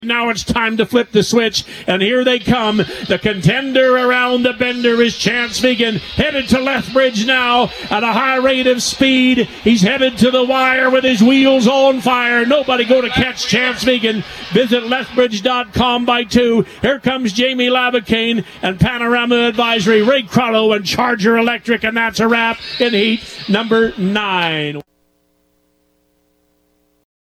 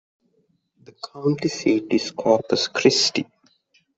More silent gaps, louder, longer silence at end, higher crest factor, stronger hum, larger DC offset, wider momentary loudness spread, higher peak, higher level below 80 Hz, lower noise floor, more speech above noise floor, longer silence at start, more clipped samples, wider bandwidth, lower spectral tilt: neither; first, -14 LUFS vs -21 LUFS; first, 2.45 s vs 0.75 s; second, 14 dB vs 20 dB; neither; neither; second, 5 LU vs 16 LU; about the same, 0 dBFS vs -2 dBFS; first, -42 dBFS vs -64 dBFS; second, -60 dBFS vs -67 dBFS; about the same, 46 dB vs 45 dB; second, 0 s vs 1.05 s; neither; first, 14.5 kHz vs 8.2 kHz; about the same, -4.5 dB/octave vs -4 dB/octave